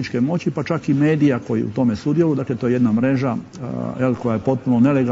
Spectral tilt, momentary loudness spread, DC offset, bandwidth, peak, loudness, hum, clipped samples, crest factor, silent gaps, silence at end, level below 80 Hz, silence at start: -8.5 dB/octave; 7 LU; under 0.1%; 7.8 kHz; -4 dBFS; -19 LUFS; none; under 0.1%; 14 dB; none; 0 s; -54 dBFS; 0 s